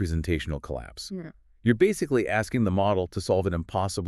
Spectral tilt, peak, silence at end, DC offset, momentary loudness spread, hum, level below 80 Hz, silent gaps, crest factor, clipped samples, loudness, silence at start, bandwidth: -6 dB/octave; -10 dBFS; 0 s; under 0.1%; 14 LU; none; -42 dBFS; none; 18 dB; under 0.1%; -26 LUFS; 0 s; 13.5 kHz